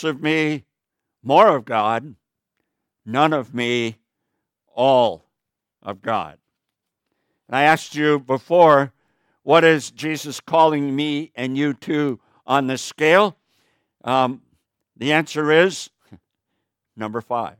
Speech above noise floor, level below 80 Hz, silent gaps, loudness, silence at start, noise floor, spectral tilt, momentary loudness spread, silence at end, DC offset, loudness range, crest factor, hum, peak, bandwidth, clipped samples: 64 dB; -70 dBFS; none; -19 LUFS; 0 s; -83 dBFS; -5 dB/octave; 17 LU; 0.1 s; under 0.1%; 6 LU; 20 dB; none; 0 dBFS; 16.5 kHz; under 0.1%